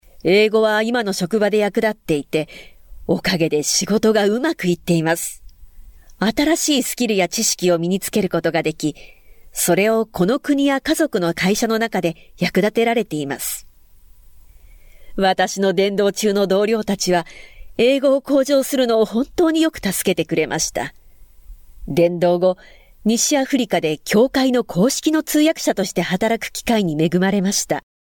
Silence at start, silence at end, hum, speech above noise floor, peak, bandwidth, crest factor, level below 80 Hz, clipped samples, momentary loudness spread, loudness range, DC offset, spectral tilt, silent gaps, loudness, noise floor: 0.25 s; 0.3 s; none; 28 dB; -6 dBFS; 18 kHz; 12 dB; -46 dBFS; under 0.1%; 7 LU; 3 LU; under 0.1%; -4 dB/octave; none; -18 LUFS; -46 dBFS